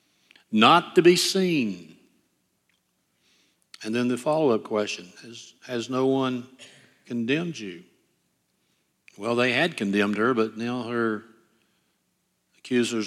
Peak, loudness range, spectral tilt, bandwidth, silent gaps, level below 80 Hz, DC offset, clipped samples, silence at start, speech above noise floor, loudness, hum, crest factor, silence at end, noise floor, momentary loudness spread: -4 dBFS; 7 LU; -4.5 dB/octave; 14 kHz; none; -76 dBFS; under 0.1%; under 0.1%; 0.5 s; 49 dB; -24 LUFS; none; 24 dB; 0 s; -73 dBFS; 20 LU